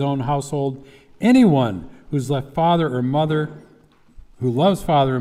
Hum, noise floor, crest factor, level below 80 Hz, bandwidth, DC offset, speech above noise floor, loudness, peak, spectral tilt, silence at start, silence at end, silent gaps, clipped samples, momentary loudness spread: none; -52 dBFS; 16 dB; -48 dBFS; 14 kHz; under 0.1%; 33 dB; -19 LUFS; -4 dBFS; -7 dB/octave; 0 s; 0 s; none; under 0.1%; 13 LU